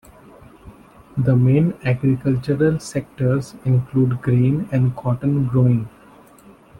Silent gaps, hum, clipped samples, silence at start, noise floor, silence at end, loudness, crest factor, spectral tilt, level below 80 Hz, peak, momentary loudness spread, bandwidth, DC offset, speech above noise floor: none; none; under 0.1%; 0.65 s; -47 dBFS; 0.9 s; -19 LUFS; 16 dB; -9 dB/octave; -48 dBFS; -4 dBFS; 6 LU; 10.5 kHz; under 0.1%; 29 dB